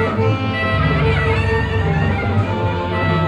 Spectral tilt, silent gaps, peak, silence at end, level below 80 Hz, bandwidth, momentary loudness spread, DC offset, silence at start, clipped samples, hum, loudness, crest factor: -7.5 dB/octave; none; -4 dBFS; 0 s; -28 dBFS; 9 kHz; 3 LU; under 0.1%; 0 s; under 0.1%; none; -18 LUFS; 12 dB